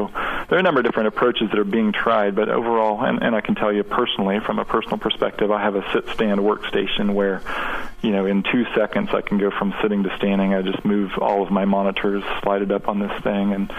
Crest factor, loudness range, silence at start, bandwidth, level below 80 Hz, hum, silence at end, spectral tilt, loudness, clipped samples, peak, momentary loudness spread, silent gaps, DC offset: 16 dB; 2 LU; 0 s; 6.4 kHz; -44 dBFS; none; 0 s; -7.5 dB/octave; -21 LUFS; under 0.1%; -4 dBFS; 4 LU; none; under 0.1%